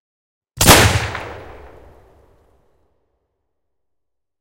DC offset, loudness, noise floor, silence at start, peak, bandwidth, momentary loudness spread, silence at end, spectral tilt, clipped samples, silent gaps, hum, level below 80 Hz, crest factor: under 0.1%; -12 LUFS; -80 dBFS; 0.55 s; 0 dBFS; 16.5 kHz; 24 LU; 2.95 s; -3 dB/octave; 0.1%; none; none; -32 dBFS; 20 dB